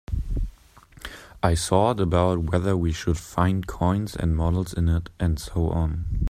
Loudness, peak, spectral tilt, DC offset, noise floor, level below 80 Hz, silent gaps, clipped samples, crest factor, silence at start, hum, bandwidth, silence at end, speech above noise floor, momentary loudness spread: -24 LUFS; -4 dBFS; -6.5 dB/octave; under 0.1%; -51 dBFS; -34 dBFS; none; under 0.1%; 20 dB; 0.1 s; none; 14.5 kHz; 0 s; 28 dB; 11 LU